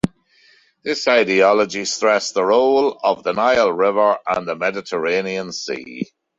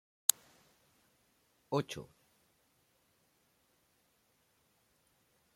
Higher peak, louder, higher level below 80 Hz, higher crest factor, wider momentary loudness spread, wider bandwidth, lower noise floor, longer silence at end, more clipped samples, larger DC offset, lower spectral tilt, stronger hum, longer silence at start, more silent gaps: about the same, -2 dBFS vs -2 dBFS; first, -18 LUFS vs -35 LUFS; first, -56 dBFS vs -80 dBFS; second, 16 dB vs 42 dB; second, 12 LU vs 17 LU; second, 10.5 kHz vs 16.5 kHz; second, -54 dBFS vs -75 dBFS; second, 0.35 s vs 3.5 s; neither; neither; about the same, -3.5 dB/octave vs -2.5 dB/octave; neither; second, 0.05 s vs 1.7 s; neither